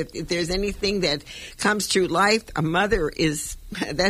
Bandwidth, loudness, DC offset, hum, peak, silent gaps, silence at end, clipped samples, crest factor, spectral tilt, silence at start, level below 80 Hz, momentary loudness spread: 15.5 kHz; -23 LUFS; under 0.1%; none; -6 dBFS; none; 0 s; under 0.1%; 16 dB; -3.5 dB/octave; 0 s; -40 dBFS; 10 LU